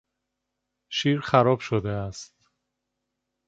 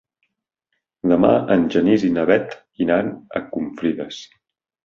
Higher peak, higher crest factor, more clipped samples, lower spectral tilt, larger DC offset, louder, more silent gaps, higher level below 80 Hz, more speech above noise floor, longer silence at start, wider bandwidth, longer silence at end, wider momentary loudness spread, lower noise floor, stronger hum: about the same, -4 dBFS vs -2 dBFS; first, 24 dB vs 18 dB; neither; about the same, -6 dB/octave vs -7 dB/octave; neither; second, -24 LUFS vs -19 LUFS; neither; about the same, -56 dBFS vs -54 dBFS; about the same, 58 dB vs 58 dB; second, 0.9 s vs 1.05 s; first, 8 kHz vs 7.2 kHz; first, 1.25 s vs 0.6 s; about the same, 14 LU vs 13 LU; first, -82 dBFS vs -76 dBFS; neither